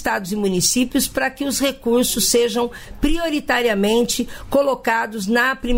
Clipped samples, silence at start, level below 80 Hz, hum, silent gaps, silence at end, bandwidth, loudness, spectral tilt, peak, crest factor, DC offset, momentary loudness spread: under 0.1%; 0 s; -34 dBFS; none; none; 0 s; 16.5 kHz; -19 LUFS; -3 dB/octave; -4 dBFS; 14 dB; under 0.1%; 6 LU